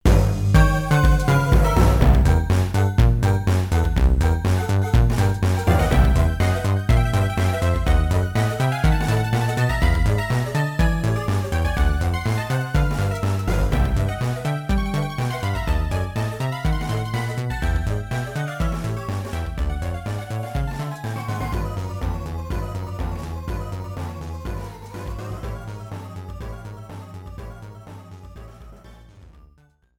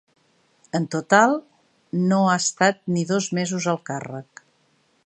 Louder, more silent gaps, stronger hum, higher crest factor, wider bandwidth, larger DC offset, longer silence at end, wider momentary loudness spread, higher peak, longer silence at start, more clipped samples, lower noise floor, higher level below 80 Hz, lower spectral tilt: about the same, -22 LUFS vs -22 LUFS; neither; neither; about the same, 18 dB vs 22 dB; first, 17.5 kHz vs 9.2 kHz; neither; about the same, 0.75 s vs 0.85 s; about the same, 16 LU vs 14 LU; about the same, -2 dBFS vs 0 dBFS; second, 0.05 s vs 0.75 s; neither; second, -56 dBFS vs -64 dBFS; first, -24 dBFS vs -70 dBFS; first, -6.5 dB/octave vs -4.5 dB/octave